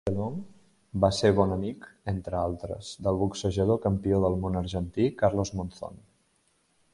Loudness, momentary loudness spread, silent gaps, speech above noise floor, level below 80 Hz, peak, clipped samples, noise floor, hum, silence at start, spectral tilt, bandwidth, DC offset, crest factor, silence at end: -28 LUFS; 14 LU; none; 42 dB; -44 dBFS; -6 dBFS; under 0.1%; -69 dBFS; none; 0.05 s; -6.5 dB/octave; 11.5 kHz; under 0.1%; 22 dB; 0.95 s